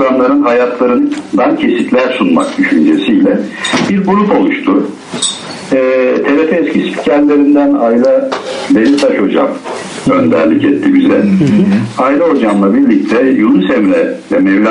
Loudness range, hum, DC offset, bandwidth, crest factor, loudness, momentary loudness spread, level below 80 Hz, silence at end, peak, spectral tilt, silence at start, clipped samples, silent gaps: 2 LU; none; under 0.1%; 10.5 kHz; 10 dB; -10 LUFS; 5 LU; -50 dBFS; 0 s; 0 dBFS; -5.5 dB/octave; 0 s; under 0.1%; none